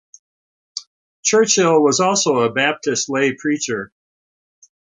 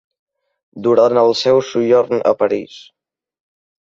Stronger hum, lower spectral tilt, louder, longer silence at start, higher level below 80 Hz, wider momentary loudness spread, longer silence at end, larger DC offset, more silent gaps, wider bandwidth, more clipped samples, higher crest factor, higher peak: neither; second, -3 dB/octave vs -5.5 dB/octave; about the same, -17 LUFS vs -15 LUFS; about the same, 0.75 s vs 0.75 s; about the same, -64 dBFS vs -60 dBFS; first, 18 LU vs 9 LU; about the same, 1.15 s vs 1.2 s; neither; first, 0.87-1.23 s vs none; first, 9.8 kHz vs 7.6 kHz; neither; about the same, 16 dB vs 16 dB; about the same, -2 dBFS vs -2 dBFS